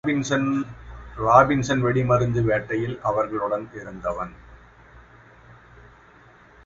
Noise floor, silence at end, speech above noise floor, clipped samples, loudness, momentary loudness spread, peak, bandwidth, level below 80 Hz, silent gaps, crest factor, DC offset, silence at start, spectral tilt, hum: -51 dBFS; 2.1 s; 29 dB; under 0.1%; -22 LUFS; 18 LU; 0 dBFS; 7.8 kHz; -46 dBFS; none; 24 dB; under 0.1%; 0.05 s; -6.5 dB/octave; none